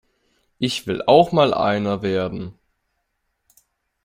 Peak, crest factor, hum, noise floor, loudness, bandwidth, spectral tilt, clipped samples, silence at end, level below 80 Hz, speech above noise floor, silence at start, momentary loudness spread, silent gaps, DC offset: -2 dBFS; 20 dB; none; -73 dBFS; -19 LUFS; 16 kHz; -6 dB/octave; under 0.1%; 1.55 s; -56 dBFS; 55 dB; 0.6 s; 13 LU; none; under 0.1%